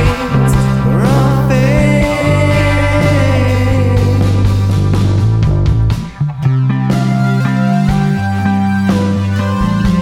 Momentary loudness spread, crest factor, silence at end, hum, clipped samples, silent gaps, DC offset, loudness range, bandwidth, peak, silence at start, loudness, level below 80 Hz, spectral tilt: 3 LU; 10 dB; 0 s; none; under 0.1%; none; under 0.1%; 2 LU; 14 kHz; 0 dBFS; 0 s; -12 LUFS; -24 dBFS; -7.5 dB/octave